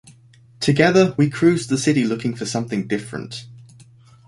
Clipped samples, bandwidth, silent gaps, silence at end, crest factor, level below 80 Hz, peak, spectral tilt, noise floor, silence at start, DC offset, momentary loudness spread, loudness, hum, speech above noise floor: under 0.1%; 11.5 kHz; none; 0.65 s; 18 dB; -56 dBFS; -2 dBFS; -5.5 dB/octave; -50 dBFS; 0.6 s; under 0.1%; 16 LU; -19 LUFS; none; 31 dB